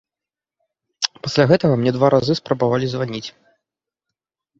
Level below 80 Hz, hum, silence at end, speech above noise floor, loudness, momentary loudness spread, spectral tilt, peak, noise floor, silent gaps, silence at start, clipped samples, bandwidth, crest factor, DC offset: -56 dBFS; none; 1.3 s; 71 dB; -18 LUFS; 11 LU; -6 dB/octave; 0 dBFS; -89 dBFS; none; 1 s; under 0.1%; 8 kHz; 20 dB; under 0.1%